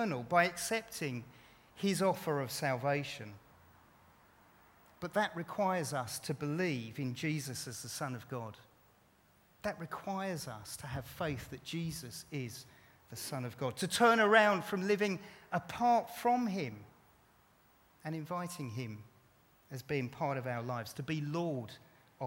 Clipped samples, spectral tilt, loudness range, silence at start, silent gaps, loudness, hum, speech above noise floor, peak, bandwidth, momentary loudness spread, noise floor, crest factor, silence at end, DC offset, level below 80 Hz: under 0.1%; -4.5 dB/octave; 11 LU; 0 s; none; -35 LUFS; none; 32 dB; -12 dBFS; 17.5 kHz; 14 LU; -68 dBFS; 26 dB; 0 s; under 0.1%; -68 dBFS